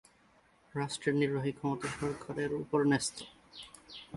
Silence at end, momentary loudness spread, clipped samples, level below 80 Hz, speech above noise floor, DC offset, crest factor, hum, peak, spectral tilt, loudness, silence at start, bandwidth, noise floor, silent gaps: 0 s; 19 LU; under 0.1%; -66 dBFS; 33 dB; under 0.1%; 18 dB; none; -16 dBFS; -5 dB/octave; -34 LUFS; 0.75 s; 11.5 kHz; -66 dBFS; none